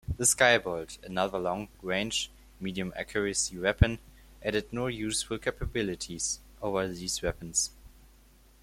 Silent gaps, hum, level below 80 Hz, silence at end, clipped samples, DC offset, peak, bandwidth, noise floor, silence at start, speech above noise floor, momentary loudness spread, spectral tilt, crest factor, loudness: none; none; -44 dBFS; 0.75 s; under 0.1%; under 0.1%; -8 dBFS; 16.5 kHz; -58 dBFS; 0.1 s; 28 dB; 11 LU; -3 dB/octave; 22 dB; -30 LUFS